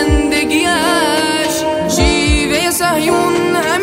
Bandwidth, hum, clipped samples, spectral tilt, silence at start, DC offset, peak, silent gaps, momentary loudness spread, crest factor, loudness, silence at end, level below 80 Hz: 16.5 kHz; none; under 0.1%; -3.5 dB/octave; 0 s; under 0.1%; 0 dBFS; none; 2 LU; 14 dB; -13 LUFS; 0 s; -24 dBFS